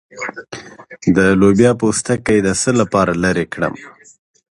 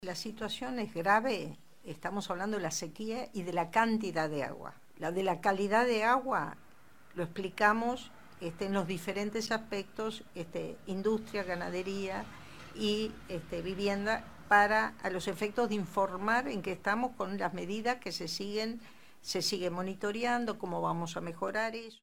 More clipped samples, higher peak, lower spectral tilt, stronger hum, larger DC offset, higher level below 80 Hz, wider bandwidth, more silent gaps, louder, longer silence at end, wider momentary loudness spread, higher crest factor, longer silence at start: neither; first, 0 dBFS vs -10 dBFS; about the same, -5.5 dB/octave vs -4.5 dB/octave; neither; second, under 0.1% vs 0.3%; first, -42 dBFS vs -64 dBFS; second, 11.5 kHz vs over 20 kHz; neither; first, -15 LUFS vs -34 LUFS; first, 0.7 s vs 0 s; first, 17 LU vs 12 LU; second, 16 dB vs 22 dB; first, 0.15 s vs 0 s